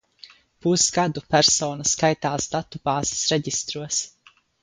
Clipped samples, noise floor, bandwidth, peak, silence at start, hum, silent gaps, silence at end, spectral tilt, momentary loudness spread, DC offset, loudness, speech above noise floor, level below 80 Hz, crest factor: under 0.1%; -50 dBFS; 10.5 kHz; -4 dBFS; 0.25 s; none; none; 0.55 s; -3 dB/octave; 9 LU; under 0.1%; -22 LUFS; 27 dB; -54 dBFS; 20 dB